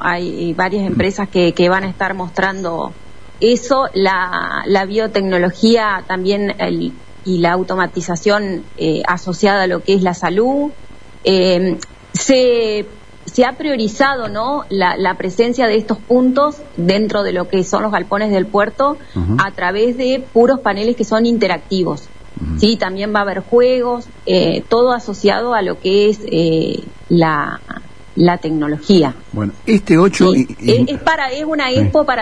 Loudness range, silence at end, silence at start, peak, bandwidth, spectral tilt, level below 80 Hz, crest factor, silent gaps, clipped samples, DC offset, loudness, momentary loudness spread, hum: 2 LU; 0 s; 0 s; 0 dBFS; 10.5 kHz; -5.5 dB/octave; -40 dBFS; 14 dB; none; under 0.1%; 2%; -15 LUFS; 8 LU; none